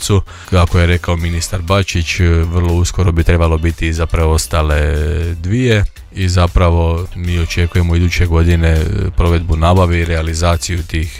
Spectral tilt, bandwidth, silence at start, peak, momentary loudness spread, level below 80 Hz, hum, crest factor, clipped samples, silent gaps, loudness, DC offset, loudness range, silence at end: -5.5 dB/octave; 14.5 kHz; 0 s; 0 dBFS; 6 LU; -20 dBFS; none; 12 dB; under 0.1%; none; -14 LUFS; under 0.1%; 1 LU; 0 s